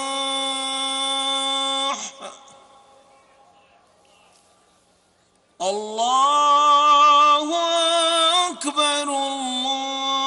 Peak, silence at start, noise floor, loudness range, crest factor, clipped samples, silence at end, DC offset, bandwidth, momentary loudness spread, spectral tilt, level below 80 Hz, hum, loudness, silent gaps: -6 dBFS; 0 s; -61 dBFS; 15 LU; 16 dB; under 0.1%; 0 s; under 0.1%; 11 kHz; 12 LU; 0 dB/octave; -70 dBFS; none; -19 LUFS; none